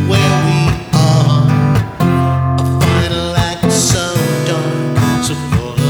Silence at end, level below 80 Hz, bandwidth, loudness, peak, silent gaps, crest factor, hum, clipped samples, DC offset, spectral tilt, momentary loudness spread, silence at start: 0 s; -30 dBFS; over 20 kHz; -13 LUFS; 0 dBFS; none; 12 dB; none; under 0.1%; under 0.1%; -5.5 dB/octave; 5 LU; 0 s